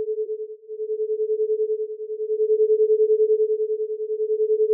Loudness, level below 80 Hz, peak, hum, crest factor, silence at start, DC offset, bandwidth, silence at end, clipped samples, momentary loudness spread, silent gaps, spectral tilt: -23 LUFS; under -90 dBFS; -12 dBFS; none; 10 dB; 0 s; under 0.1%; 0.6 kHz; 0 s; under 0.1%; 11 LU; none; 0.5 dB/octave